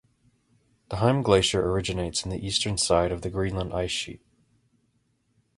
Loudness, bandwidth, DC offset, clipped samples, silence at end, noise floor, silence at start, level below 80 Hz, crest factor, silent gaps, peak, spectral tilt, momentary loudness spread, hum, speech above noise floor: -25 LUFS; 11.5 kHz; under 0.1%; under 0.1%; 1.4 s; -70 dBFS; 0.9 s; -44 dBFS; 22 dB; none; -6 dBFS; -4.5 dB/octave; 8 LU; none; 45 dB